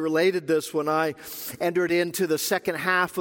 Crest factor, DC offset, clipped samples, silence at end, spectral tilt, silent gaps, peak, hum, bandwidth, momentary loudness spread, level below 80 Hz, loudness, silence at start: 16 dB; under 0.1%; under 0.1%; 0 s; -4 dB/octave; none; -8 dBFS; none; 17 kHz; 6 LU; -68 dBFS; -25 LUFS; 0 s